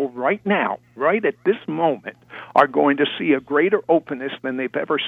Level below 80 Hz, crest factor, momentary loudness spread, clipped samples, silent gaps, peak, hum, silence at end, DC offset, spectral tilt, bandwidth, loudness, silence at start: -68 dBFS; 20 dB; 9 LU; under 0.1%; none; 0 dBFS; none; 0 s; under 0.1%; -7.5 dB/octave; 5.6 kHz; -20 LUFS; 0 s